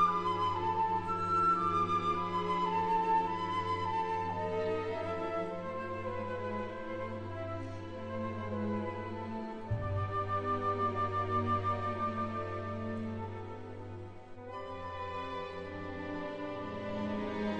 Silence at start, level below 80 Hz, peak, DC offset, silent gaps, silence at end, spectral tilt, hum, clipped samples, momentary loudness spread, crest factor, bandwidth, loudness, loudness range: 0 s; -58 dBFS; -18 dBFS; 0.2%; none; 0 s; -7 dB/octave; none; under 0.1%; 11 LU; 16 dB; 9.2 kHz; -35 LUFS; 10 LU